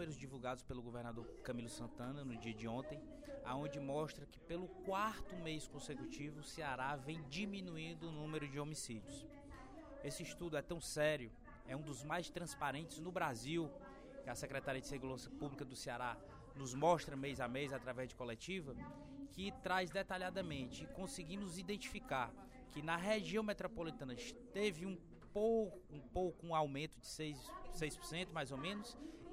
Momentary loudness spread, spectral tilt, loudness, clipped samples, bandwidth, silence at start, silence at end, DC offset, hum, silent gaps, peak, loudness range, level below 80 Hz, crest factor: 12 LU; -4.5 dB/octave; -45 LUFS; under 0.1%; 16 kHz; 0 s; 0 s; under 0.1%; none; none; -22 dBFS; 5 LU; -62 dBFS; 22 dB